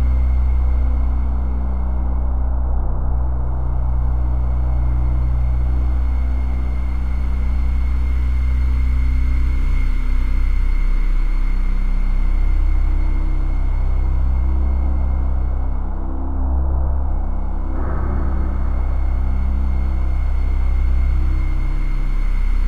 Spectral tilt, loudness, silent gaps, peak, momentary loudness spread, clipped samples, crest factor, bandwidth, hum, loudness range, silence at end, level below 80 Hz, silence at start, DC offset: -9 dB/octave; -22 LUFS; none; -8 dBFS; 4 LU; under 0.1%; 8 dB; 4.5 kHz; none; 2 LU; 0 s; -16 dBFS; 0 s; 6%